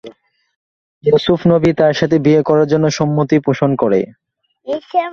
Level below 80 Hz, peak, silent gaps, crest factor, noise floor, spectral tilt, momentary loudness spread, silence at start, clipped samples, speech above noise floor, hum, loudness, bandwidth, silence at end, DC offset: -50 dBFS; 0 dBFS; 0.56-1.01 s; 14 dB; -40 dBFS; -7 dB/octave; 9 LU; 0.05 s; under 0.1%; 27 dB; none; -14 LUFS; 7.2 kHz; 0 s; under 0.1%